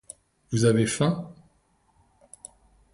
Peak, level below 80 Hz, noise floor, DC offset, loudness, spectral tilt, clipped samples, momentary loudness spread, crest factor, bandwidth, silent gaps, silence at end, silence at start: -8 dBFS; -58 dBFS; -66 dBFS; under 0.1%; -24 LUFS; -5.5 dB/octave; under 0.1%; 25 LU; 20 dB; 11.5 kHz; none; 1.6 s; 0.5 s